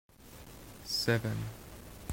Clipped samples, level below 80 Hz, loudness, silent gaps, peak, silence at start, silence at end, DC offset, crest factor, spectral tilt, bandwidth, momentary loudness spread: under 0.1%; -56 dBFS; -34 LUFS; none; -16 dBFS; 0.2 s; 0 s; under 0.1%; 22 dB; -4.5 dB/octave; 16.5 kHz; 21 LU